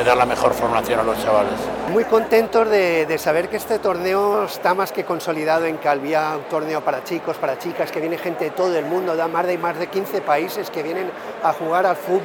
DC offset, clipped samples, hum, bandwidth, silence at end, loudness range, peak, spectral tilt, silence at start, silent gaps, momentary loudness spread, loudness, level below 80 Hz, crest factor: under 0.1%; under 0.1%; none; 20 kHz; 0 s; 4 LU; -4 dBFS; -5 dB/octave; 0 s; none; 8 LU; -20 LUFS; -52 dBFS; 16 dB